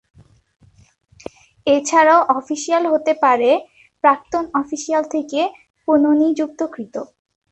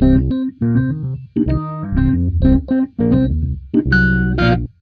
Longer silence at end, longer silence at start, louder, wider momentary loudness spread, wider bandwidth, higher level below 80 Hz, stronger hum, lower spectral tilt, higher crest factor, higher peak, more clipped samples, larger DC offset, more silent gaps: first, 0.45 s vs 0.15 s; first, 1.65 s vs 0 s; about the same, -17 LUFS vs -17 LUFS; first, 17 LU vs 7 LU; first, 8.6 kHz vs 5.2 kHz; second, -62 dBFS vs -24 dBFS; neither; second, -3.5 dB/octave vs -9.5 dB/octave; about the same, 18 dB vs 14 dB; about the same, 0 dBFS vs 0 dBFS; neither; neither; first, 5.70-5.74 s vs none